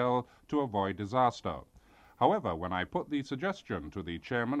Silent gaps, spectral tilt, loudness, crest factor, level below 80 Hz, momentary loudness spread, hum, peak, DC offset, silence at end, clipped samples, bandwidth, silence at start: none; -6.5 dB/octave; -33 LUFS; 22 dB; -58 dBFS; 10 LU; none; -10 dBFS; under 0.1%; 0 s; under 0.1%; 9.6 kHz; 0 s